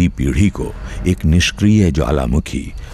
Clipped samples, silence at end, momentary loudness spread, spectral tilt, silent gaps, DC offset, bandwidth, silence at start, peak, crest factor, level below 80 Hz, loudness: under 0.1%; 0 s; 12 LU; -6 dB/octave; none; under 0.1%; 14 kHz; 0 s; -2 dBFS; 12 dB; -24 dBFS; -16 LUFS